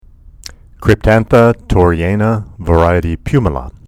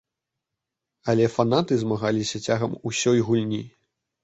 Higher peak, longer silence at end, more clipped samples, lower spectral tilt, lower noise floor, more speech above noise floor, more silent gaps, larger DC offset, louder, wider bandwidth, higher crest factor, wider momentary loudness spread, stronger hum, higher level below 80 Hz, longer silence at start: first, 0 dBFS vs -6 dBFS; second, 0.15 s vs 0.55 s; first, 0.3% vs under 0.1%; first, -8 dB/octave vs -5.5 dB/octave; second, -35 dBFS vs -85 dBFS; second, 24 dB vs 62 dB; neither; neither; first, -13 LUFS vs -24 LUFS; first, 14.5 kHz vs 8.2 kHz; second, 12 dB vs 20 dB; second, 6 LU vs 9 LU; neither; first, -24 dBFS vs -58 dBFS; second, 0.8 s vs 1.05 s